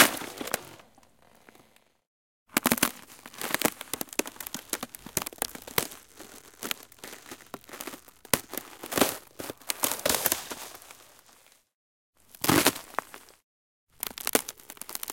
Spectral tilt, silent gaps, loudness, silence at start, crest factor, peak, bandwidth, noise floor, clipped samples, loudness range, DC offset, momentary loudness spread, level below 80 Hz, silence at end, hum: -2 dB/octave; 2.07-2.46 s, 11.74-12.13 s, 13.44-13.87 s; -29 LUFS; 0 s; 32 dB; 0 dBFS; 17 kHz; -62 dBFS; under 0.1%; 5 LU; under 0.1%; 21 LU; -62 dBFS; 0 s; none